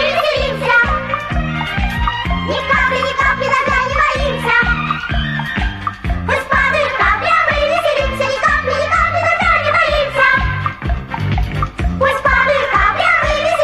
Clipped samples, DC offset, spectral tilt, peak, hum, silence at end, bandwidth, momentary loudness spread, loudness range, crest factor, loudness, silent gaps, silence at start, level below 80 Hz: under 0.1%; under 0.1%; -5 dB/octave; -2 dBFS; none; 0 s; 13.5 kHz; 7 LU; 2 LU; 14 dB; -14 LUFS; none; 0 s; -26 dBFS